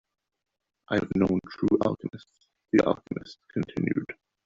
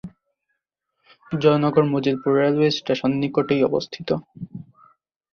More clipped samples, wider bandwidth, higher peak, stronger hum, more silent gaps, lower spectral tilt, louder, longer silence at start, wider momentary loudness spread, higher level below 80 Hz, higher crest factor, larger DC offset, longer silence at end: neither; first, 7.6 kHz vs 6.8 kHz; second, -8 dBFS vs -4 dBFS; neither; neither; about the same, -6.5 dB/octave vs -7 dB/octave; second, -28 LUFS vs -21 LUFS; first, 0.9 s vs 0.05 s; second, 13 LU vs 16 LU; about the same, -58 dBFS vs -60 dBFS; about the same, 20 dB vs 18 dB; neither; second, 0.35 s vs 0.7 s